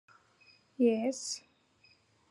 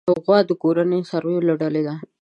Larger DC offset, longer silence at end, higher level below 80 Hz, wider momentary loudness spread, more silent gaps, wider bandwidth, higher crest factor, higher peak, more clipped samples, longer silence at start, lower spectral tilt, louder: neither; first, 0.9 s vs 0.2 s; second, under -90 dBFS vs -68 dBFS; first, 14 LU vs 6 LU; neither; first, 12 kHz vs 8 kHz; about the same, 20 dB vs 18 dB; second, -16 dBFS vs -2 dBFS; neither; first, 0.8 s vs 0.05 s; second, -3.5 dB/octave vs -8.5 dB/octave; second, -32 LUFS vs -20 LUFS